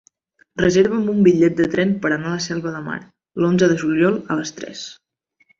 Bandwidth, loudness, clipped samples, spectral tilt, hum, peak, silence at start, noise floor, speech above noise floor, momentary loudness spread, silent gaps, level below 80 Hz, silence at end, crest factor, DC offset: 7.6 kHz; -18 LUFS; under 0.1%; -6 dB/octave; none; -2 dBFS; 0.55 s; -61 dBFS; 43 dB; 16 LU; none; -52 dBFS; 0.65 s; 16 dB; under 0.1%